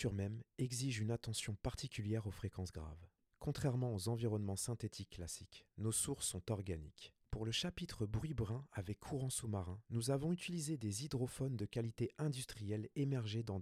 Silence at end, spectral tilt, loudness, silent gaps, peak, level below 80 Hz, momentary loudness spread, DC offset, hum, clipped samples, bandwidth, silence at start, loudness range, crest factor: 0 s; -5 dB/octave; -43 LUFS; none; -24 dBFS; -60 dBFS; 9 LU; under 0.1%; none; under 0.1%; 15.5 kHz; 0 s; 2 LU; 18 dB